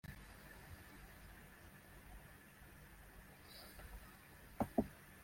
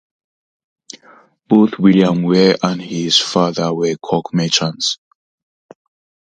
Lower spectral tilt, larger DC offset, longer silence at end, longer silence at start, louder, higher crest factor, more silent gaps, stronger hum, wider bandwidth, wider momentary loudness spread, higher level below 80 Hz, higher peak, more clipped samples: about the same, -6 dB/octave vs -5 dB/octave; neither; second, 0 s vs 1.25 s; second, 0.05 s vs 1.5 s; second, -52 LUFS vs -15 LUFS; first, 30 dB vs 16 dB; neither; neither; first, 16.5 kHz vs 9.6 kHz; first, 18 LU vs 8 LU; about the same, -62 dBFS vs -58 dBFS; second, -22 dBFS vs 0 dBFS; neither